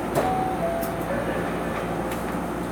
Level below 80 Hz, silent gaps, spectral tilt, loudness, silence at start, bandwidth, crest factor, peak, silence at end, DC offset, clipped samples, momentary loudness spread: -42 dBFS; none; -6 dB/octave; -27 LUFS; 0 s; over 20 kHz; 18 dB; -8 dBFS; 0 s; under 0.1%; under 0.1%; 4 LU